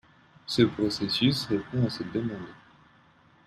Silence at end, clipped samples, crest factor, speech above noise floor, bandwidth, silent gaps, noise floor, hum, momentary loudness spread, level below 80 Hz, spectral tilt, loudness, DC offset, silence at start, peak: 0.9 s; under 0.1%; 22 dB; 33 dB; 14 kHz; none; -60 dBFS; none; 15 LU; -60 dBFS; -6 dB/octave; -27 LUFS; under 0.1%; 0.5 s; -8 dBFS